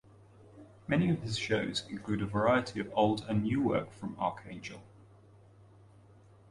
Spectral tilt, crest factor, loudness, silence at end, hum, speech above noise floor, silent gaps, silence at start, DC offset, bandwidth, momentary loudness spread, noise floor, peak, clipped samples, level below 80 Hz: -6 dB/octave; 20 dB; -32 LUFS; 1.7 s; none; 27 dB; none; 0.55 s; under 0.1%; 11.5 kHz; 15 LU; -59 dBFS; -14 dBFS; under 0.1%; -60 dBFS